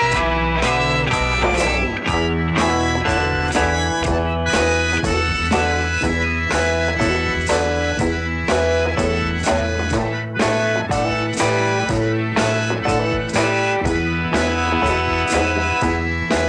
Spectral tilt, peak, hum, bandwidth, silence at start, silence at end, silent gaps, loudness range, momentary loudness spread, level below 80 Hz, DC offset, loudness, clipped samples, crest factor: -5 dB/octave; -4 dBFS; none; 10.5 kHz; 0 s; 0 s; none; 1 LU; 2 LU; -30 dBFS; under 0.1%; -19 LUFS; under 0.1%; 16 dB